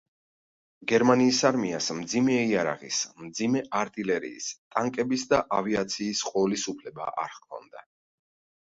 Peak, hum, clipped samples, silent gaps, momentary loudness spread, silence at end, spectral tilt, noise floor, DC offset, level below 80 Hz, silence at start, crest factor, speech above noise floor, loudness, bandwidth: -8 dBFS; none; under 0.1%; 4.58-4.71 s; 13 LU; 0.85 s; -4 dB/octave; under -90 dBFS; under 0.1%; -64 dBFS; 0.8 s; 20 dB; over 63 dB; -27 LUFS; 8 kHz